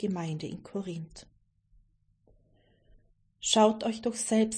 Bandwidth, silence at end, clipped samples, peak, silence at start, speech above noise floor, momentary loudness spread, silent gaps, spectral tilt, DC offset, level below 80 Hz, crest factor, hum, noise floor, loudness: 10.5 kHz; 0 s; under 0.1%; -10 dBFS; 0 s; 38 dB; 16 LU; none; -4 dB/octave; under 0.1%; -64 dBFS; 22 dB; none; -67 dBFS; -29 LUFS